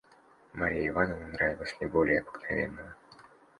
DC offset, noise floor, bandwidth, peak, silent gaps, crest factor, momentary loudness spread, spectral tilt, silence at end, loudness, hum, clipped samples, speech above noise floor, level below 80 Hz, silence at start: under 0.1%; -60 dBFS; 11 kHz; -12 dBFS; none; 22 dB; 13 LU; -7 dB/octave; 0.4 s; -31 LUFS; none; under 0.1%; 30 dB; -52 dBFS; 0.55 s